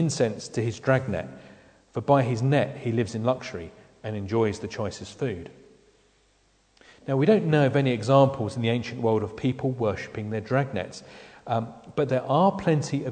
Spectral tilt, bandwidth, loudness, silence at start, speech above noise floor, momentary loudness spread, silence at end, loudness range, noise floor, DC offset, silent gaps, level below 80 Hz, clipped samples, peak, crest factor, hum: -6.5 dB/octave; 9.4 kHz; -25 LUFS; 0 s; 39 dB; 16 LU; 0 s; 7 LU; -64 dBFS; under 0.1%; none; -58 dBFS; under 0.1%; -4 dBFS; 20 dB; none